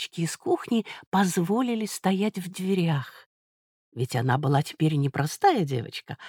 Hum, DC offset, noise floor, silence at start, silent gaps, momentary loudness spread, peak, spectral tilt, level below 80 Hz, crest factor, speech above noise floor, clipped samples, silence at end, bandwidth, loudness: none; under 0.1%; under -90 dBFS; 0 s; 1.07-1.12 s, 3.26-3.92 s; 8 LU; -8 dBFS; -6 dB/octave; -68 dBFS; 18 dB; over 64 dB; under 0.1%; 0 s; 18.5 kHz; -26 LUFS